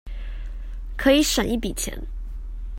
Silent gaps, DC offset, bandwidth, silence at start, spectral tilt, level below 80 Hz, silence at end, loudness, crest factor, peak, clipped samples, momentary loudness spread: none; under 0.1%; 16.5 kHz; 0.05 s; -3.5 dB/octave; -32 dBFS; 0 s; -22 LUFS; 20 dB; -6 dBFS; under 0.1%; 19 LU